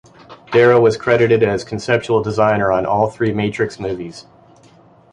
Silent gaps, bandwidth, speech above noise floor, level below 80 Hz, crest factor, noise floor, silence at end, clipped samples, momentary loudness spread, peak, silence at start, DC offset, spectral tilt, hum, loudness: none; 10 kHz; 32 dB; -48 dBFS; 16 dB; -48 dBFS; 0.9 s; under 0.1%; 11 LU; 0 dBFS; 0.3 s; under 0.1%; -6.5 dB/octave; none; -16 LUFS